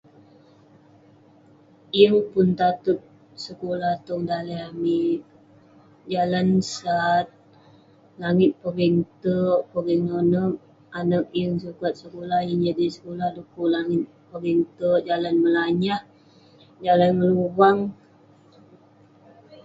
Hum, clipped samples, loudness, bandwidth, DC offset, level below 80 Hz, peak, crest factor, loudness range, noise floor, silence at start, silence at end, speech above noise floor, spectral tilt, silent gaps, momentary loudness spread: none; under 0.1%; -23 LUFS; 7.8 kHz; under 0.1%; -62 dBFS; -2 dBFS; 22 dB; 4 LU; -54 dBFS; 1.95 s; 0.1 s; 32 dB; -7 dB/octave; none; 12 LU